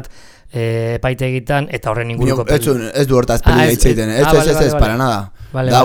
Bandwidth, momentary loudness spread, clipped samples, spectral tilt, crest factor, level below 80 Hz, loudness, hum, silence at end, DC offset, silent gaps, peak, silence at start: 19 kHz; 8 LU; under 0.1%; -5.5 dB/octave; 14 dB; -22 dBFS; -15 LUFS; none; 0 s; under 0.1%; none; 0 dBFS; 0 s